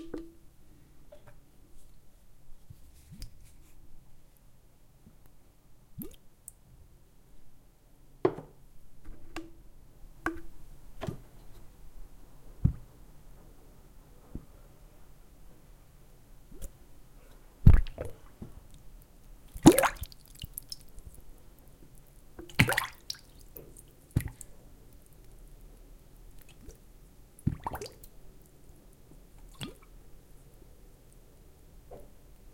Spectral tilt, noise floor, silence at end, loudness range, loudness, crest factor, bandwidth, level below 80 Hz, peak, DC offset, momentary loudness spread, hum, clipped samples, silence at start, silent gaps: -5.5 dB/octave; -57 dBFS; 0.5 s; 24 LU; -31 LUFS; 34 dB; 17 kHz; -40 dBFS; -2 dBFS; under 0.1%; 30 LU; none; under 0.1%; 0 s; none